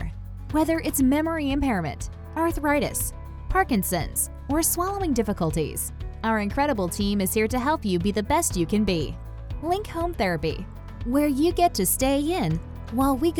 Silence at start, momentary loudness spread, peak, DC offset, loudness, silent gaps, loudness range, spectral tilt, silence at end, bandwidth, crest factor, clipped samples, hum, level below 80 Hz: 0 s; 10 LU; -8 dBFS; under 0.1%; -25 LUFS; none; 1 LU; -4.5 dB/octave; 0 s; over 20 kHz; 16 dB; under 0.1%; none; -36 dBFS